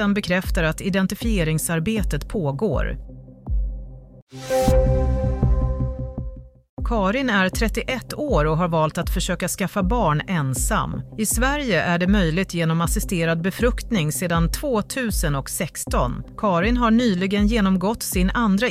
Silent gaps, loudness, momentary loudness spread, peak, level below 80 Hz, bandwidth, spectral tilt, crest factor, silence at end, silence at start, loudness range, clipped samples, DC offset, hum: 4.22-4.27 s, 6.69-6.77 s; -22 LUFS; 9 LU; -6 dBFS; -28 dBFS; 16 kHz; -5 dB/octave; 16 dB; 0 s; 0 s; 3 LU; under 0.1%; under 0.1%; none